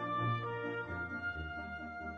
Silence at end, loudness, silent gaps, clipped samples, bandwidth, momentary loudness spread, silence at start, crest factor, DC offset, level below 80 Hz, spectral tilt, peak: 0 s; -39 LUFS; none; under 0.1%; 6.2 kHz; 8 LU; 0 s; 14 dB; under 0.1%; -56 dBFS; -8 dB/octave; -24 dBFS